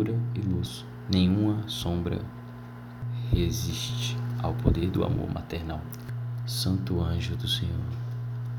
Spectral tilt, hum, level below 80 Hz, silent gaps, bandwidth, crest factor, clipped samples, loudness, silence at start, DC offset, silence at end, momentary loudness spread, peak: -6 dB/octave; none; -40 dBFS; none; 18 kHz; 24 dB; under 0.1%; -29 LUFS; 0 s; under 0.1%; 0 s; 11 LU; -6 dBFS